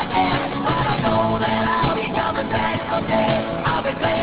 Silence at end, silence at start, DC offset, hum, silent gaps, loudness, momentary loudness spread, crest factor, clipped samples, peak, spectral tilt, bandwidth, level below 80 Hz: 0 s; 0 s; under 0.1%; none; none; -20 LUFS; 2 LU; 14 dB; under 0.1%; -6 dBFS; -10 dB/octave; 4 kHz; -40 dBFS